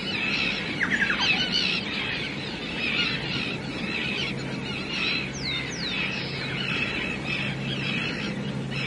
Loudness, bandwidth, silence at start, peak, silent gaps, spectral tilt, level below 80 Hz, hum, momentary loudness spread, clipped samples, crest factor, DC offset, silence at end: -26 LUFS; 11.5 kHz; 0 s; -12 dBFS; none; -4 dB/octave; -50 dBFS; none; 8 LU; under 0.1%; 16 dB; under 0.1%; 0 s